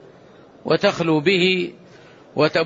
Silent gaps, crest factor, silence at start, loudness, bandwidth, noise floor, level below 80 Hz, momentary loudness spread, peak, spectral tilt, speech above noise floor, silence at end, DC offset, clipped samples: none; 16 dB; 0.65 s; -19 LUFS; 7.8 kHz; -47 dBFS; -62 dBFS; 14 LU; -6 dBFS; -5.5 dB/octave; 29 dB; 0 s; under 0.1%; under 0.1%